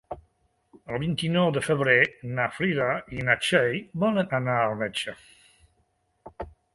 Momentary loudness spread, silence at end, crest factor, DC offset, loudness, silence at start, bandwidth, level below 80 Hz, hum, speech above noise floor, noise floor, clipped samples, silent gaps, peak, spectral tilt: 15 LU; 0.25 s; 22 dB; under 0.1%; -25 LUFS; 0.1 s; 11.5 kHz; -56 dBFS; none; 45 dB; -70 dBFS; under 0.1%; none; -6 dBFS; -5.5 dB/octave